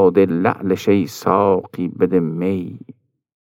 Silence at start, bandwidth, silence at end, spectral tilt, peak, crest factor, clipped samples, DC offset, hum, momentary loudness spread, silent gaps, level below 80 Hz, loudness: 0 s; 16.5 kHz; 0.8 s; -7.5 dB/octave; -2 dBFS; 16 dB; under 0.1%; under 0.1%; none; 10 LU; none; -64 dBFS; -18 LUFS